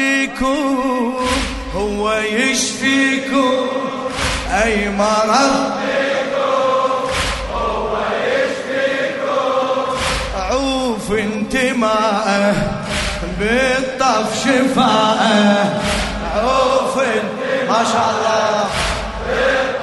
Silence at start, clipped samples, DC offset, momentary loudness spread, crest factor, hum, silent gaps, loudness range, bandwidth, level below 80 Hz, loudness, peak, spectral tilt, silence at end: 0 s; under 0.1%; under 0.1%; 6 LU; 16 dB; none; none; 3 LU; 12 kHz; -34 dBFS; -16 LUFS; 0 dBFS; -4 dB/octave; 0 s